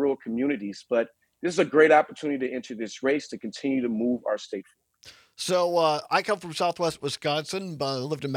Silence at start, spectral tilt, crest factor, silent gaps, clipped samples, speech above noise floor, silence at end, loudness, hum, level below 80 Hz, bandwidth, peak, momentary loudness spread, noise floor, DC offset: 0 s; -4.5 dB/octave; 20 dB; none; under 0.1%; 27 dB; 0 s; -26 LUFS; none; -70 dBFS; 15.5 kHz; -6 dBFS; 12 LU; -53 dBFS; under 0.1%